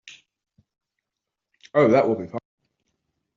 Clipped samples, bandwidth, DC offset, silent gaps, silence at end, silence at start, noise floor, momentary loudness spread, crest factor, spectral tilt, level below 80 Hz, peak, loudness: under 0.1%; 7.4 kHz; under 0.1%; none; 1 s; 1.75 s; -85 dBFS; 18 LU; 20 dB; -6 dB/octave; -68 dBFS; -6 dBFS; -20 LUFS